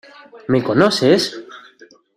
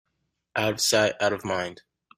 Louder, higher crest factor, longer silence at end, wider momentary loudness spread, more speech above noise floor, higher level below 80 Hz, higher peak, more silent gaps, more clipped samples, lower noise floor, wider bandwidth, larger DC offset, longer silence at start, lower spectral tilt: first, -16 LUFS vs -25 LUFS; about the same, 16 dB vs 20 dB; first, 0.6 s vs 0.45 s; first, 18 LU vs 10 LU; second, 32 dB vs 53 dB; first, -56 dBFS vs -62 dBFS; first, -2 dBFS vs -8 dBFS; neither; neither; second, -48 dBFS vs -78 dBFS; second, 14 kHz vs 16 kHz; neither; second, 0.35 s vs 0.55 s; first, -5 dB/octave vs -2.5 dB/octave